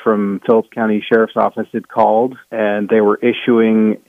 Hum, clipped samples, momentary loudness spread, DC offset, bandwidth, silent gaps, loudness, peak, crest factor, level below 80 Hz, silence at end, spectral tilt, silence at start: none; under 0.1%; 6 LU; under 0.1%; 3.9 kHz; none; -15 LUFS; 0 dBFS; 14 dB; -64 dBFS; 0.1 s; -8.5 dB/octave; 0 s